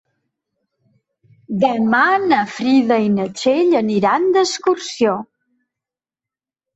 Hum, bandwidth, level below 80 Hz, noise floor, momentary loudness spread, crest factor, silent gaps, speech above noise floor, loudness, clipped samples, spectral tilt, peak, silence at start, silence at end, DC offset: none; 8.2 kHz; -62 dBFS; -89 dBFS; 5 LU; 16 dB; none; 73 dB; -16 LUFS; under 0.1%; -5 dB/octave; -2 dBFS; 1.5 s; 1.5 s; under 0.1%